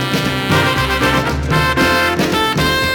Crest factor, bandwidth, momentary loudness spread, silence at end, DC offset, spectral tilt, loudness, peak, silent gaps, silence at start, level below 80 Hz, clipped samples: 14 dB; over 20 kHz; 4 LU; 0 s; under 0.1%; -4.5 dB/octave; -14 LUFS; -2 dBFS; none; 0 s; -30 dBFS; under 0.1%